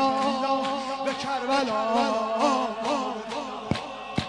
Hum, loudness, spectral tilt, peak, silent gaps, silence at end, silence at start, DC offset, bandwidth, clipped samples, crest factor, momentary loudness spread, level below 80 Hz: none; -27 LUFS; -4.5 dB/octave; -10 dBFS; none; 0 s; 0 s; under 0.1%; 10.5 kHz; under 0.1%; 16 dB; 7 LU; -56 dBFS